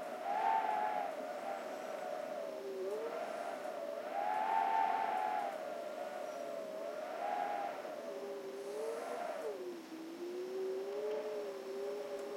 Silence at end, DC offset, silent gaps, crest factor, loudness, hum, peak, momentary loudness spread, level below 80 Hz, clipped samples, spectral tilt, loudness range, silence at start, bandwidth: 0 s; under 0.1%; none; 16 dB; -40 LUFS; none; -24 dBFS; 10 LU; under -90 dBFS; under 0.1%; -3.5 dB/octave; 5 LU; 0 s; 16.5 kHz